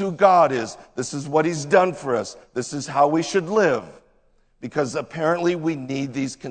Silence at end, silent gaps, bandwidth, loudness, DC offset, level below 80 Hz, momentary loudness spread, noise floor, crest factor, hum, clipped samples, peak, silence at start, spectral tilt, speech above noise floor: 0 s; none; 9.4 kHz; -22 LUFS; under 0.1%; -60 dBFS; 12 LU; -60 dBFS; 20 dB; none; under 0.1%; -2 dBFS; 0 s; -5 dB/octave; 38 dB